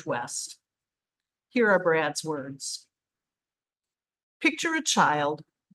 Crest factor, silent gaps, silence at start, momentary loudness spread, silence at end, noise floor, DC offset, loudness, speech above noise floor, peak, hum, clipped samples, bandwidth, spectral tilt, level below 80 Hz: 22 dB; 4.23-4.40 s; 0.05 s; 13 LU; 0.3 s; under -90 dBFS; under 0.1%; -26 LUFS; over 64 dB; -8 dBFS; none; under 0.1%; 12.5 kHz; -3 dB/octave; -80 dBFS